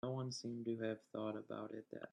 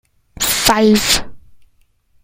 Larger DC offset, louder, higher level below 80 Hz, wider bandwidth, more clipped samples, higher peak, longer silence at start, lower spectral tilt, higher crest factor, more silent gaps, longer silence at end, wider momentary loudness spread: neither; second, -46 LUFS vs -13 LUFS; second, -84 dBFS vs -36 dBFS; second, 10 kHz vs 16.5 kHz; neither; second, -28 dBFS vs 0 dBFS; second, 0.05 s vs 0.4 s; first, -6 dB/octave vs -2.5 dB/octave; about the same, 16 dB vs 18 dB; neither; second, 0.05 s vs 0.7 s; about the same, 6 LU vs 6 LU